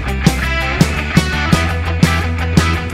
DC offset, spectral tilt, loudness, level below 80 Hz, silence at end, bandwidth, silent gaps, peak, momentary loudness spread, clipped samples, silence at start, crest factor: under 0.1%; -5.5 dB/octave; -15 LUFS; -22 dBFS; 0 s; 16.5 kHz; none; 0 dBFS; 2 LU; 0.3%; 0 s; 14 dB